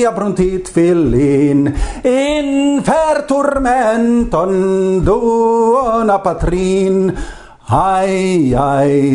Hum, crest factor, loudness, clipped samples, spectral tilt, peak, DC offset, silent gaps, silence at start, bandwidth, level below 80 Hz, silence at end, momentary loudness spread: none; 12 dB; -13 LUFS; under 0.1%; -6.5 dB/octave; 0 dBFS; under 0.1%; none; 0 s; 11 kHz; -28 dBFS; 0 s; 4 LU